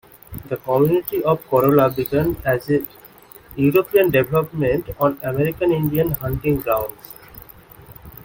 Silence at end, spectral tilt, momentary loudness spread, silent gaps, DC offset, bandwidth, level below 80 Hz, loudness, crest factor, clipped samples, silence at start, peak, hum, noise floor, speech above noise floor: 0.15 s; -8 dB/octave; 20 LU; none; under 0.1%; 17 kHz; -44 dBFS; -19 LUFS; 18 dB; under 0.1%; 0.3 s; -2 dBFS; none; -45 dBFS; 26 dB